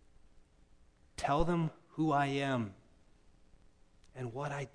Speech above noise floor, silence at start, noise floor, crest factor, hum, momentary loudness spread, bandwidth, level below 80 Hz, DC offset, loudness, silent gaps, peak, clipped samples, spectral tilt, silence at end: 30 dB; 0.35 s; -63 dBFS; 22 dB; none; 13 LU; 10.5 kHz; -52 dBFS; under 0.1%; -35 LUFS; none; -16 dBFS; under 0.1%; -6.5 dB/octave; 0.05 s